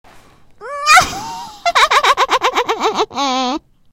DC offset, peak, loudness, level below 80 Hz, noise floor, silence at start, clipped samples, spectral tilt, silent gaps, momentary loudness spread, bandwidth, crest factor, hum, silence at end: under 0.1%; 0 dBFS; -14 LUFS; -46 dBFS; -43 dBFS; 0.15 s; under 0.1%; -1 dB/octave; none; 15 LU; 18.5 kHz; 16 dB; none; 0.35 s